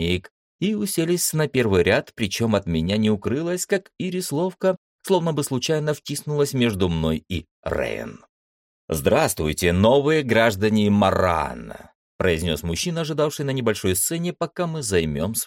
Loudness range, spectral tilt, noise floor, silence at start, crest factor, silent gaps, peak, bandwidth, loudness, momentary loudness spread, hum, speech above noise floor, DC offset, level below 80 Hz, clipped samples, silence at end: 4 LU; -5 dB/octave; under -90 dBFS; 0 s; 16 dB; 0.31-0.59 s, 4.78-4.99 s, 7.51-7.63 s, 8.29-8.88 s, 11.95-12.19 s; -6 dBFS; 16.5 kHz; -22 LUFS; 9 LU; none; over 68 dB; under 0.1%; -44 dBFS; under 0.1%; 0 s